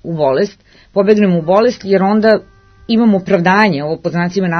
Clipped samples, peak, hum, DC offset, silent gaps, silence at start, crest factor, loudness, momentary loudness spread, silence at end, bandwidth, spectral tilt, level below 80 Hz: under 0.1%; 0 dBFS; none; under 0.1%; none; 0.05 s; 12 dB; -13 LUFS; 7 LU; 0 s; 6.6 kHz; -7 dB/octave; -50 dBFS